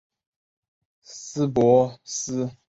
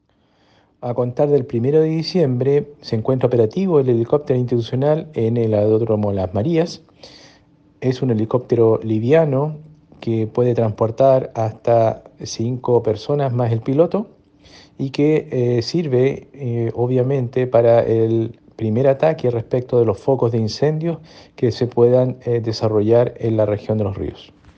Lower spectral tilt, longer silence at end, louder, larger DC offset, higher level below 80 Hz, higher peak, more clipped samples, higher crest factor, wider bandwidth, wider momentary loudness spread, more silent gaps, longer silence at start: second, -6 dB/octave vs -8 dB/octave; second, 0.15 s vs 0.3 s; second, -22 LUFS vs -18 LUFS; neither; about the same, -58 dBFS vs -54 dBFS; second, -6 dBFS vs 0 dBFS; neither; about the same, 20 dB vs 16 dB; first, 8.2 kHz vs 7.2 kHz; first, 19 LU vs 10 LU; neither; first, 1.1 s vs 0.8 s